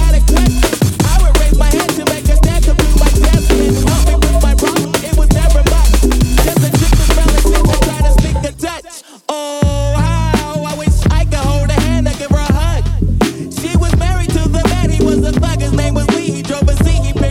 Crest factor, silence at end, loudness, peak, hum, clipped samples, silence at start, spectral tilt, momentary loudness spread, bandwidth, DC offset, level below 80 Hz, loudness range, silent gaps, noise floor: 10 dB; 0 s; -13 LUFS; 0 dBFS; none; under 0.1%; 0 s; -5.5 dB/octave; 5 LU; 17 kHz; under 0.1%; -12 dBFS; 3 LU; none; -34 dBFS